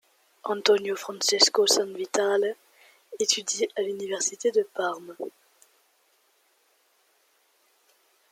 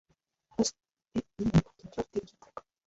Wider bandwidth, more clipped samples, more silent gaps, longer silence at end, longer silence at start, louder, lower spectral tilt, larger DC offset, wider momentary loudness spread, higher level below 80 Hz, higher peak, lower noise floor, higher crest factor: first, 16 kHz vs 8.2 kHz; neither; neither; first, 3.05 s vs 0.25 s; second, 0.45 s vs 0.6 s; first, -25 LUFS vs -33 LUFS; second, -0.5 dB/octave vs -6 dB/octave; neither; about the same, 19 LU vs 20 LU; second, -82 dBFS vs -52 dBFS; first, -4 dBFS vs -12 dBFS; about the same, -67 dBFS vs -69 dBFS; about the same, 24 dB vs 20 dB